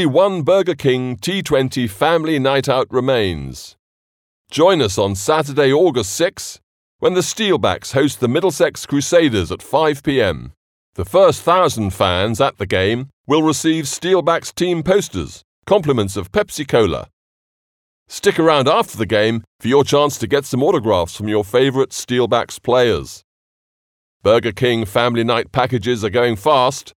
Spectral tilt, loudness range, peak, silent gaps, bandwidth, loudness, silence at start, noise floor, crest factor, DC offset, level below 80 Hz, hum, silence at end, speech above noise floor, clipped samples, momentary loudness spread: -5 dB/octave; 2 LU; 0 dBFS; 3.79-4.45 s, 6.63-6.99 s, 10.57-10.93 s, 13.13-13.24 s, 15.44-15.62 s, 17.13-18.06 s, 19.47-19.59 s, 23.24-24.20 s; 17.5 kHz; -16 LUFS; 0 s; under -90 dBFS; 16 dB; under 0.1%; -48 dBFS; none; 0.05 s; over 74 dB; under 0.1%; 7 LU